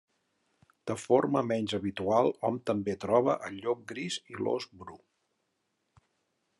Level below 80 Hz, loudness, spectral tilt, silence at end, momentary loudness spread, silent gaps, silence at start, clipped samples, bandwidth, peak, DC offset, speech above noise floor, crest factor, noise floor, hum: -80 dBFS; -30 LUFS; -5.5 dB/octave; 1.65 s; 11 LU; none; 0.85 s; under 0.1%; 11.5 kHz; -10 dBFS; under 0.1%; 49 dB; 22 dB; -79 dBFS; none